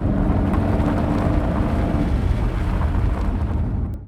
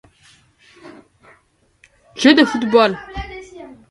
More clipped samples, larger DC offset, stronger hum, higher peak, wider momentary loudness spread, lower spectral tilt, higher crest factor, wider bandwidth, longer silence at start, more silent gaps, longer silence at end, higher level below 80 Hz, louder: neither; neither; neither; second, -6 dBFS vs 0 dBFS; second, 3 LU vs 26 LU; first, -9 dB/octave vs -4.5 dB/octave; second, 12 dB vs 20 dB; about the same, 10.5 kHz vs 11.5 kHz; second, 0 s vs 0.85 s; neither; second, 0 s vs 0.25 s; first, -24 dBFS vs -44 dBFS; second, -21 LUFS vs -14 LUFS